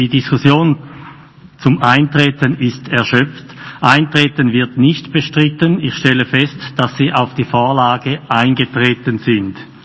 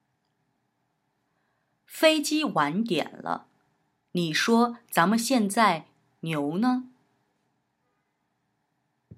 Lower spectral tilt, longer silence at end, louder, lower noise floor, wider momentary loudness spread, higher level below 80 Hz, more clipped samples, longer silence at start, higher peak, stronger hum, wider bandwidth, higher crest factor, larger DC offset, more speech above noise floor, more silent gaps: first, -6.5 dB/octave vs -4 dB/octave; first, 0.2 s vs 0 s; first, -13 LUFS vs -25 LUFS; second, -39 dBFS vs -76 dBFS; second, 7 LU vs 12 LU; first, -48 dBFS vs -82 dBFS; first, 0.4% vs under 0.1%; second, 0 s vs 1.9 s; first, 0 dBFS vs -6 dBFS; neither; second, 8 kHz vs 16 kHz; second, 14 dB vs 22 dB; neither; second, 26 dB vs 51 dB; neither